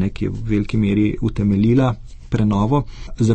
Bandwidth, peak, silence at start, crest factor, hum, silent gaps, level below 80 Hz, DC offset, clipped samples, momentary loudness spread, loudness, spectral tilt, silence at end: 8.6 kHz; -4 dBFS; 0 s; 14 dB; none; none; -32 dBFS; under 0.1%; under 0.1%; 9 LU; -19 LUFS; -8.5 dB/octave; 0 s